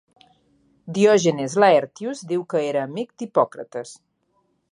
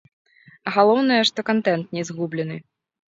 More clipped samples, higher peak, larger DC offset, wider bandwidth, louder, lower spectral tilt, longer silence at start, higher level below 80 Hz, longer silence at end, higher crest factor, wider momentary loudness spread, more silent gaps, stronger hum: neither; about the same, -2 dBFS vs -2 dBFS; neither; first, 11 kHz vs 8 kHz; about the same, -21 LUFS vs -21 LUFS; about the same, -5 dB/octave vs -5 dB/octave; first, 0.85 s vs 0.65 s; about the same, -70 dBFS vs -70 dBFS; first, 0.75 s vs 0.55 s; about the same, 20 dB vs 20 dB; first, 17 LU vs 14 LU; neither; neither